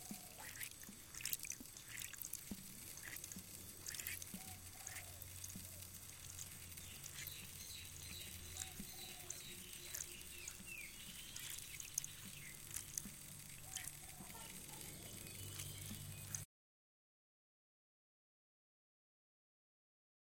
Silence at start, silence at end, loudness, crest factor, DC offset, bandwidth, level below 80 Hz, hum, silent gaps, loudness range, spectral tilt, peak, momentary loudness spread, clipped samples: 0 s; 3.9 s; -49 LUFS; 34 dB; under 0.1%; 17 kHz; -68 dBFS; none; none; 3 LU; -1.5 dB/octave; -18 dBFS; 6 LU; under 0.1%